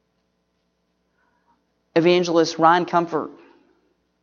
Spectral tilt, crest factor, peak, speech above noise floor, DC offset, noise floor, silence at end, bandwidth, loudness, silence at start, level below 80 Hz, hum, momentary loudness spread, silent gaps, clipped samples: -5 dB/octave; 20 dB; -2 dBFS; 52 dB; under 0.1%; -71 dBFS; 0.9 s; 7.2 kHz; -19 LUFS; 1.95 s; -72 dBFS; none; 11 LU; none; under 0.1%